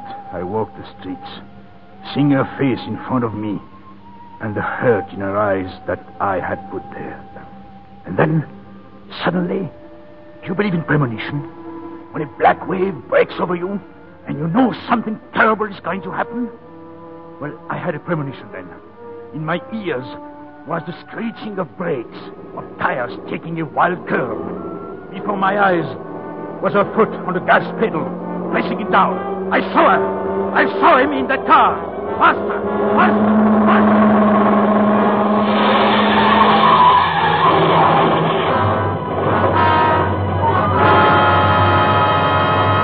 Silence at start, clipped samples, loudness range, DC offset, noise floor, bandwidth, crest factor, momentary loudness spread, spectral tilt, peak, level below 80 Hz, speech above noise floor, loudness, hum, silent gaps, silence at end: 0 s; under 0.1%; 13 LU; 0.4%; -40 dBFS; 5.2 kHz; 16 dB; 18 LU; -11 dB/octave; 0 dBFS; -50 dBFS; 22 dB; -16 LUFS; none; none; 0 s